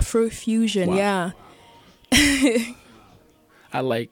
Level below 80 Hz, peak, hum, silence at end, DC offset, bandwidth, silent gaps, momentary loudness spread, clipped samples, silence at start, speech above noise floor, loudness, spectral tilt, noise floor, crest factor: -42 dBFS; -4 dBFS; none; 0.05 s; under 0.1%; 17.5 kHz; none; 12 LU; under 0.1%; 0 s; 34 dB; -21 LUFS; -4 dB/octave; -55 dBFS; 18 dB